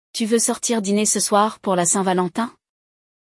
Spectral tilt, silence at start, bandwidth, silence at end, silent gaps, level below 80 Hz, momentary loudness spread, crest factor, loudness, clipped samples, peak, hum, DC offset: -3.5 dB/octave; 0.15 s; 12 kHz; 0.9 s; none; -68 dBFS; 6 LU; 16 dB; -19 LUFS; under 0.1%; -4 dBFS; none; under 0.1%